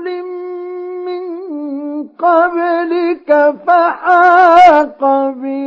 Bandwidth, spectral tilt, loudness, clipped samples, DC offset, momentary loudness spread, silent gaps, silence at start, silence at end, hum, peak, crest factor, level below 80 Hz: 7.4 kHz; -4.5 dB/octave; -11 LUFS; under 0.1%; under 0.1%; 17 LU; none; 0 s; 0 s; none; 0 dBFS; 12 dB; -54 dBFS